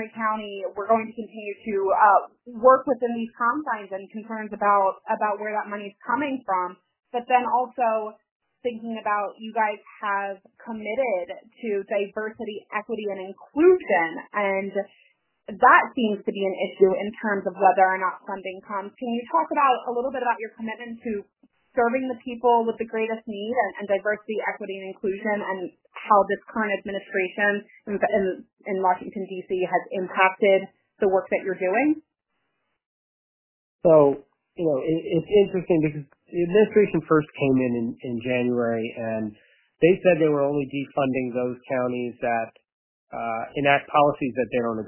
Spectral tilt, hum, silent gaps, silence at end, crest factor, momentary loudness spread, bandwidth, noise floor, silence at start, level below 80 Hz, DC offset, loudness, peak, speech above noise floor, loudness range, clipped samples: -10 dB/octave; none; 8.31-8.40 s, 32.86-33.79 s, 42.72-43.07 s; 0 s; 22 dB; 14 LU; 3.2 kHz; -77 dBFS; 0 s; -64 dBFS; under 0.1%; -24 LUFS; -2 dBFS; 53 dB; 5 LU; under 0.1%